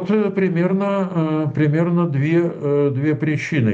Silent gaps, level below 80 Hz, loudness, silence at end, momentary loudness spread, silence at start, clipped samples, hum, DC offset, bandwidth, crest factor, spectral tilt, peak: none; -62 dBFS; -19 LUFS; 0 s; 2 LU; 0 s; under 0.1%; none; under 0.1%; 7.6 kHz; 12 dB; -8.5 dB/octave; -6 dBFS